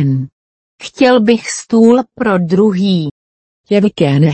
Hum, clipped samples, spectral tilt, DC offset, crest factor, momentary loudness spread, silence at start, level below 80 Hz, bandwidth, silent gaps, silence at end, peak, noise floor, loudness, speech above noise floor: none; under 0.1%; -6.5 dB/octave; under 0.1%; 12 dB; 13 LU; 0 s; -54 dBFS; 8.8 kHz; 0.32-0.78 s, 3.11-3.64 s; 0 s; 0 dBFS; under -90 dBFS; -12 LUFS; over 79 dB